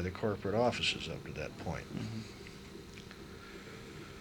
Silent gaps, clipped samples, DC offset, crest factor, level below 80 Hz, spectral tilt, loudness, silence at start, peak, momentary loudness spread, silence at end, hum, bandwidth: none; under 0.1%; under 0.1%; 20 dB; -58 dBFS; -5 dB/octave; -37 LUFS; 0 s; -18 dBFS; 17 LU; 0 s; none; 19 kHz